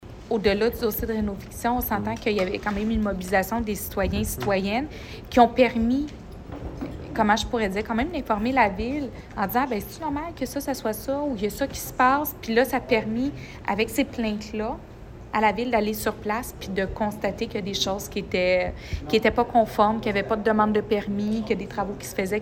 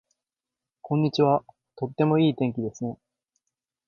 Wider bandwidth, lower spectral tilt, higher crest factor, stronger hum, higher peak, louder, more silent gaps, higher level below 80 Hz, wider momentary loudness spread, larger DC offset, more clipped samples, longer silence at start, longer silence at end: first, 17 kHz vs 7.2 kHz; second, -5 dB/octave vs -8 dB/octave; about the same, 22 dB vs 20 dB; neither; first, -4 dBFS vs -8 dBFS; about the same, -25 LUFS vs -25 LUFS; neither; first, -42 dBFS vs -66 dBFS; second, 9 LU vs 13 LU; neither; neither; second, 0 s vs 0.85 s; second, 0 s vs 0.95 s